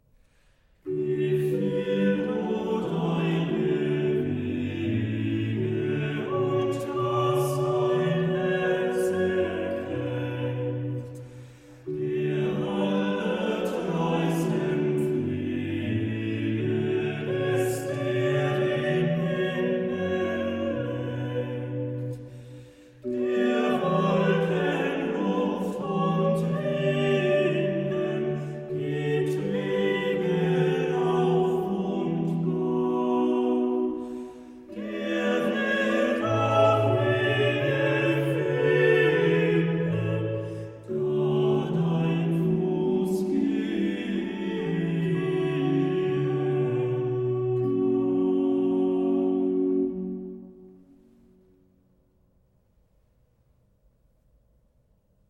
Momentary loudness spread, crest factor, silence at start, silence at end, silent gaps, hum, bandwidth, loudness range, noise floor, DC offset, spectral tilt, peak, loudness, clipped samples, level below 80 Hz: 7 LU; 16 dB; 0.85 s; 4.55 s; none; none; 14 kHz; 5 LU; -65 dBFS; under 0.1%; -7.5 dB/octave; -10 dBFS; -26 LUFS; under 0.1%; -62 dBFS